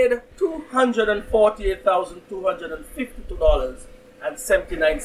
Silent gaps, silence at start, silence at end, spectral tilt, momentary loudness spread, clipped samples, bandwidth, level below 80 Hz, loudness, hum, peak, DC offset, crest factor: none; 0 s; 0 s; -4.5 dB/octave; 13 LU; under 0.1%; 15 kHz; -32 dBFS; -22 LUFS; none; -4 dBFS; under 0.1%; 18 dB